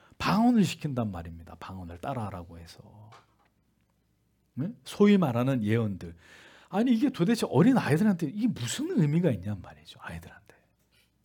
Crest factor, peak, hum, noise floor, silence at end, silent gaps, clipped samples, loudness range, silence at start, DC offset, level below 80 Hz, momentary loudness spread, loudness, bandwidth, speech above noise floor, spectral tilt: 18 dB; -10 dBFS; none; -71 dBFS; 0.9 s; none; under 0.1%; 15 LU; 0.2 s; under 0.1%; -62 dBFS; 21 LU; -27 LUFS; 17.5 kHz; 43 dB; -6.5 dB/octave